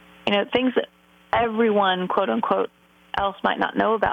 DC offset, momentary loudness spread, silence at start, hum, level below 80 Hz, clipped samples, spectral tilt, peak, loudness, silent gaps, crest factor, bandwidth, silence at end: under 0.1%; 7 LU; 0.25 s; none; -54 dBFS; under 0.1%; -6.5 dB/octave; -6 dBFS; -23 LUFS; none; 16 dB; 7.4 kHz; 0 s